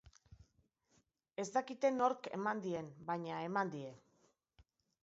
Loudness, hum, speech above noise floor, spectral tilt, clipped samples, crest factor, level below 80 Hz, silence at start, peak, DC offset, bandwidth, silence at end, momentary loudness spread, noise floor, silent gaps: -39 LUFS; none; 39 dB; -4.5 dB/octave; under 0.1%; 22 dB; -76 dBFS; 0.05 s; -20 dBFS; under 0.1%; 7.6 kHz; 1.05 s; 12 LU; -77 dBFS; none